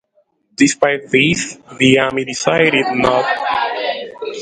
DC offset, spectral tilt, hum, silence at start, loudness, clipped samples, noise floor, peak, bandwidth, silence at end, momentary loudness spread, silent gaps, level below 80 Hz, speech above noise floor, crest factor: under 0.1%; -4 dB/octave; none; 0.6 s; -15 LUFS; under 0.1%; -60 dBFS; 0 dBFS; 9.6 kHz; 0 s; 10 LU; none; -50 dBFS; 46 dB; 16 dB